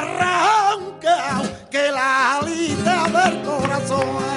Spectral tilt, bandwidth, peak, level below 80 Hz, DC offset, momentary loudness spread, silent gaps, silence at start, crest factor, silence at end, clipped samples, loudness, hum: -4 dB/octave; 11.5 kHz; -4 dBFS; -54 dBFS; under 0.1%; 6 LU; none; 0 s; 14 dB; 0 s; under 0.1%; -19 LUFS; none